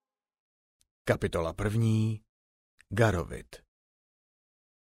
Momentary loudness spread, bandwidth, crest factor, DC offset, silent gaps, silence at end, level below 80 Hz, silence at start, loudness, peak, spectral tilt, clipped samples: 14 LU; 15 kHz; 22 dB; under 0.1%; 2.29-2.78 s; 1.4 s; -50 dBFS; 1.05 s; -30 LUFS; -10 dBFS; -7 dB/octave; under 0.1%